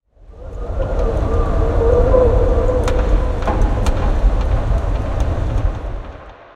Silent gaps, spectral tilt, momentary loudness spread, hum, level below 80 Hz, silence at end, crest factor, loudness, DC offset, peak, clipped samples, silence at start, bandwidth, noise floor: none; -8 dB/octave; 16 LU; none; -18 dBFS; 0.2 s; 14 dB; -18 LUFS; under 0.1%; 0 dBFS; under 0.1%; 0.3 s; 9 kHz; -35 dBFS